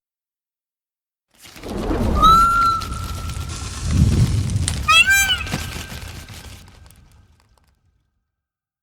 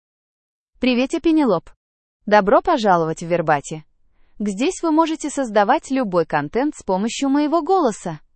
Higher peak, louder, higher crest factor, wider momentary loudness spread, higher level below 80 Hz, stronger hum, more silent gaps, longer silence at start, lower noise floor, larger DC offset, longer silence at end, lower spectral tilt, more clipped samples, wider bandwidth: about the same, -2 dBFS vs -2 dBFS; about the same, -17 LUFS vs -19 LUFS; about the same, 18 dB vs 18 dB; first, 22 LU vs 7 LU; first, -30 dBFS vs -50 dBFS; neither; second, none vs 1.76-2.20 s; first, 1.45 s vs 0.8 s; first, under -90 dBFS vs -51 dBFS; neither; first, 2.2 s vs 0.2 s; second, -3.5 dB/octave vs -5 dB/octave; neither; first, over 20 kHz vs 8.8 kHz